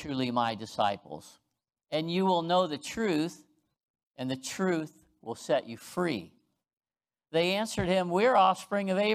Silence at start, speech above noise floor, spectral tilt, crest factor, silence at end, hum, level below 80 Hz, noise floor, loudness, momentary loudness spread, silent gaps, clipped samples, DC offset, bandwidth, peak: 0 s; 55 dB; -5 dB/octave; 18 dB; 0 s; none; -64 dBFS; -84 dBFS; -29 LUFS; 14 LU; 3.83-3.94 s, 4.03-4.11 s, 6.77-6.81 s; under 0.1%; under 0.1%; 15.5 kHz; -12 dBFS